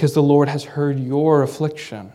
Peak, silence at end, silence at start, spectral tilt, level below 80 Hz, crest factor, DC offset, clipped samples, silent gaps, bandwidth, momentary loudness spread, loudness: -2 dBFS; 0.05 s; 0 s; -7.5 dB/octave; -66 dBFS; 16 dB; under 0.1%; under 0.1%; none; 14 kHz; 10 LU; -18 LUFS